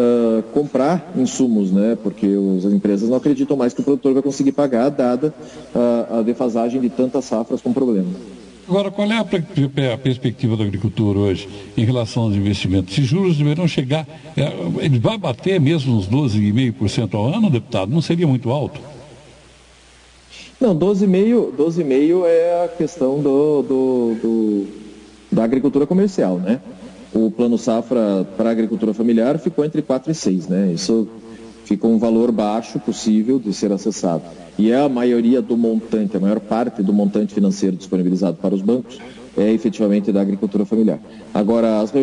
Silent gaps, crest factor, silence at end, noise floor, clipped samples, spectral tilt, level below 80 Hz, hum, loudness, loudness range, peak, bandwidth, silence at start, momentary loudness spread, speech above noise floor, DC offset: none; 12 dB; 0 s; -47 dBFS; under 0.1%; -7 dB/octave; -54 dBFS; none; -18 LUFS; 3 LU; -4 dBFS; 10.5 kHz; 0 s; 6 LU; 30 dB; under 0.1%